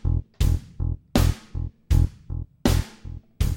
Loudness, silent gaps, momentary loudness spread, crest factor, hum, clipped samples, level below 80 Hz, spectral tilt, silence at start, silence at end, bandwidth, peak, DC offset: -26 LUFS; none; 13 LU; 18 dB; none; under 0.1%; -26 dBFS; -6 dB/octave; 0.05 s; 0 s; 17 kHz; -6 dBFS; 0.2%